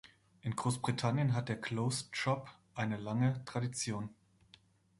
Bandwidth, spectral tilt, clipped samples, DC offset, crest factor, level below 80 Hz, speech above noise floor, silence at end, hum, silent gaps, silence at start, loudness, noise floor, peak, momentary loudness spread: 11.5 kHz; -5.5 dB/octave; under 0.1%; under 0.1%; 18 dB; -68 dBFS; 30 dB; 0.85 s; none; none; 0.45 s; -36 LUFS; -66 dBFS; -18 dBFS; 8 LU